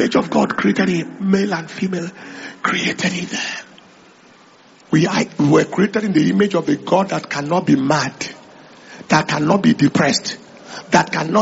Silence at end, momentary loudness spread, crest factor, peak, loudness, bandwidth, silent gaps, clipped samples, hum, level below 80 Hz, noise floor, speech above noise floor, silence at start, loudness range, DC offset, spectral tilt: 0 s; 13 LU; 18 dB; 0 dBFS; -17 LUFS; 8 kHz; none; under 0.1%; none; -56 dBFS; -47 dBFS; 30 dB; 0 s; 5 LU; under 0.1%; -4.5 dB/octave